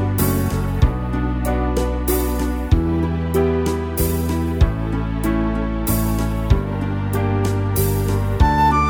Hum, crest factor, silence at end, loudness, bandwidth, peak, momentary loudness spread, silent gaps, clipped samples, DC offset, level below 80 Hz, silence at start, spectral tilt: none; 16 dB; 0 s; -20 LUFS; 19.5 kHz; -2 dBFS; 4 LU; none; under 0.1%; under 0.1%; -24 dBFS; 0 s; -6.5 dB/octave